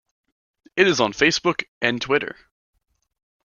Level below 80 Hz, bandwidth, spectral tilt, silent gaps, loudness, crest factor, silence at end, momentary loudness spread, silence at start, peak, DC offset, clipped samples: -60 dBFS; 7.2 kHz; -3.5 dB/octave; 1.68-1.81 s; -20 LUFS; 22 dB; 1.1 s; 7 LU; 0.75 s; -2 dBFS; under 0.1%; under 0.1%